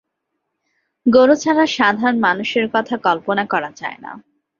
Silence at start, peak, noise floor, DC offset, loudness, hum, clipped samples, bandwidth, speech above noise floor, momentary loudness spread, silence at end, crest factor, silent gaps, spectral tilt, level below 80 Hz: 1.05 s; -2 dBFS; -75 dBFS; under 0.1%; -16 LUFS; none; under 0.1%; 7.2 kHz; 59 dB; 15 LU; 0.4 s; 16 dB; none; -4.5 dB/octave; -60 dBFS